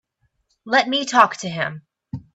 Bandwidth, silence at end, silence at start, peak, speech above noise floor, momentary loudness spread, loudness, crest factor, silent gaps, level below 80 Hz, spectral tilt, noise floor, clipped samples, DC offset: 10 kHz; 0.15 s; 0.65 s; 0 dBFS; 49 dB; 17 LU; -19 LUFS; 22 dB; none; -60 dBFS; -3.5 dB/octave; -68 dBFS; under 0.1%; under 0.1%